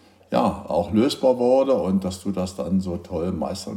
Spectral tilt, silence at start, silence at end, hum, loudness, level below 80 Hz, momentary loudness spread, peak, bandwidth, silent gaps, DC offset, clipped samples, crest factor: -6.5 dB/octave; 0.3 s; 0 s; none; -22 LUFS; -52 dBFS; 9 LU; -6 dBFS; 14.5 kHz; none; under 0.1%; under 0.1%; 16 dB